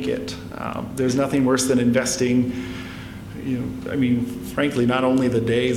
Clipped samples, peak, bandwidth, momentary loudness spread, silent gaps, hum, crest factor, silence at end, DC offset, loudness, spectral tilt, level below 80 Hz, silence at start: under 0.1%; -6 dBFS; 15.5 kHz; 13 LU; none; none; 16 dB; 0 s; under 0.1%; -22 LUFS; -5 dB/octave; -46 dBFS; 0 s